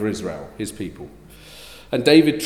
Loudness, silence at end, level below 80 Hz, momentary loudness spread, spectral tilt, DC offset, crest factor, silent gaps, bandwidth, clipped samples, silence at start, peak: -20 LUFS; 0 s; -50 dBFS; 26 LU; -5 dB/octave; under 0.1%; 20 dB; none; 14.5 kHz; under 0.1%; 0 s; -2 dBFS